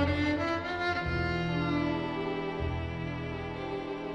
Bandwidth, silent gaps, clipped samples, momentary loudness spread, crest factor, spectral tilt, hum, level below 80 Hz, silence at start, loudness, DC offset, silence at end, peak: 9.2 kHz; none; under 0.1%; 7 LU; 16 dB; -7 dB/octave; none; -46 dBFS; 0 s; -32 LUFS; under 0.1%; 0 s; -16 dBFS